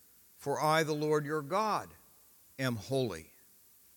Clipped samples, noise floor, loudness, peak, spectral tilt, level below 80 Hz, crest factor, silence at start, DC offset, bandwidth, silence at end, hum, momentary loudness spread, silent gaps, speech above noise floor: under 0.1%; -62 dBFS; -33 LUFS; -16 dBFS; -5 dB/octave; -74 dBFS; 20 dB; 0.4 s; under 0.1%; 18 kHz; 0.75 s; none; 15 LU; none; 30 dB